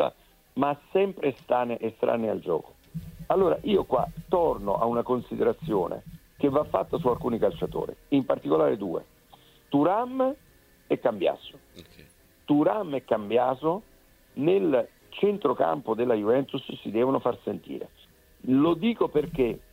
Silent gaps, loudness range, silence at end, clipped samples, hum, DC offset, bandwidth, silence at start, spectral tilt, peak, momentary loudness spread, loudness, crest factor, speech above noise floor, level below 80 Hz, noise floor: none; 2 LU; 0.15 s; under 0.1%; none; under 0.1%; 16 kHz; 0 s; -8 dB/octave; -8 dBFS; 12 LU; -27 LUFS; 18 dB; 30 dB; -54 dBFS; -56 dBFS